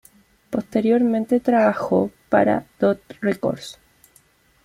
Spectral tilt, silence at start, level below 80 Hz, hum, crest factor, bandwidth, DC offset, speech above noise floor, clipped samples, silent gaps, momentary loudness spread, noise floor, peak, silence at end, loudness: -7 dB/octave; 0.5 s; -58 dBFS; none; 16 dB; 14.5 kHz; under 0.1%; 38 dB; under 0.1%; none; 10 LU; -57 dBFS; -6 dBFS; 0.95 s; -21 LUFS